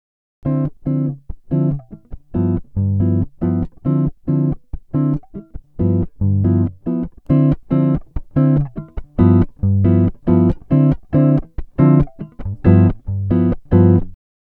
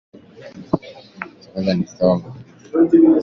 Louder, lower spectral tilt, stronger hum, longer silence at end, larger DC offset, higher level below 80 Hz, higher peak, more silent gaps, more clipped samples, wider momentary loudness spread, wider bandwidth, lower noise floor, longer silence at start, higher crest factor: about the same, -17 LUFS vs -18 LUFS; first, -13 dB/octave vs -8 dB/octave; neither; first, 0.4 s vs 0 s; neither; first, -32 dBFS vs -52 dBFS; about the same, 0 dBFS vs -2 dBFS; neither; neither; second, 12 LU vs 26 LU; second, 3.2 kHz vs 6.4 kHz; second, -34 dBFS vs -39 dBFS; about the same, 0.45 s vs 0.4 s; about the same, 16 dB vs 16 dB